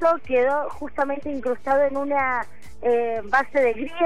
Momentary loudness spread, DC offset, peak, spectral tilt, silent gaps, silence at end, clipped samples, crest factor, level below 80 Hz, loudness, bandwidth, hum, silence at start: 7 LU; 2%; -8 dBFS; -5.5 dB/octave; none; 0 s; under 0.1%; 14 dB; -52 dBFS; -23 LUFS; 11 kHz; none; 0 s